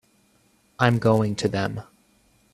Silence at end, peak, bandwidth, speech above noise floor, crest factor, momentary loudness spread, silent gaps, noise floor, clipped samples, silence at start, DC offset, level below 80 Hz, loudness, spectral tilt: 0.7 s; -4 dBFS; 13 kHz; 41 dB; 22 dB; 10 LU; none; -62 dBFS; under 0.1%; 0.8 s; under 0.1%; -56 dBFS; -23 LUFS; -6.5 dB/octave